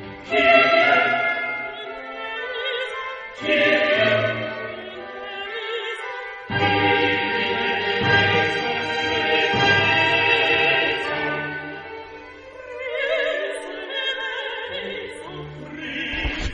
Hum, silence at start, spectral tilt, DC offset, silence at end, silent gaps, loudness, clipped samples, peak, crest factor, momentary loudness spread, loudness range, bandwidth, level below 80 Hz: none; 0 s; -4.5 dB/octave; under 0.1%; 0 s; none; -20 LUFS; under 0.1%; -2 dBFS; 20 dB; 17 LU; 8 LU; 10 kHz; -46 dBFS